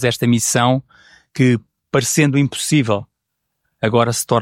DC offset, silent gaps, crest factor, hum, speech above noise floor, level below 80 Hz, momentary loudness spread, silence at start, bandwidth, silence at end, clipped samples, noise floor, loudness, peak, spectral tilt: under 0.1%; none; 16 dB; none; 60 dB; -54 dBFS; 8 LU; 0 s; 16.5 kHz; 0 s; under 0.1%; -75 dBFS; -17 LUFS; -2 dBFS; -4.5 dB/octave